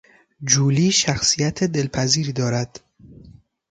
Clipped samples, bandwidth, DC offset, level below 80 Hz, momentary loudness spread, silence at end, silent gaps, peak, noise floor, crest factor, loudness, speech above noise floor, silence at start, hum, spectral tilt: under 0.1%; 9.4 kHz; under 0.1%; -50 dBFS; 8 LU; 0.4 s; none; -2 dBFS; -48 dBFS; 18 dB; -19 LUFS; 28 dB; 0.4 s; none; -3.5 dB/octave